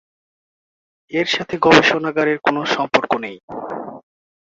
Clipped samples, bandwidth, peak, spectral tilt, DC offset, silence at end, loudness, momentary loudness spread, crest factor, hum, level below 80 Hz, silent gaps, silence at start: under 0.1%; 7.8 kHz; 0 dBFS; -4.5 dB/octave; under 0.1%; 0.45 s; -17 LUFS; 18 LU; 20 dB; none; -56 dBFS; 3.43-3.48 s; 1.1 s